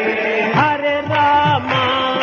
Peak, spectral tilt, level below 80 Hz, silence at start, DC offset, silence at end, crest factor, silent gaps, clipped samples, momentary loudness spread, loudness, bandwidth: -4 dBFS; -6 dB/octave; -52 dBFS; 0 s; under 0.1%; 0 s; 12 dB; none; under 0.1%; 4 LU; -15 LUFS; 7 kHz